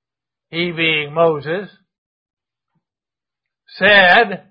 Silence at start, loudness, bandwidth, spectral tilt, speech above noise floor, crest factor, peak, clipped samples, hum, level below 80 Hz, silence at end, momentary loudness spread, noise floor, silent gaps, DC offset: 0.55 s; -13 LUFS; 5.4 kHz; -6.5 dB/octave; 74 dB; 18 dB; 0 dBFS; under 0.1%; none; -58 dBFS; 0.1 s; 16 LU; -89 dBFS; 1.98-2.26 s, 2.33-2.37 s; under 0.1%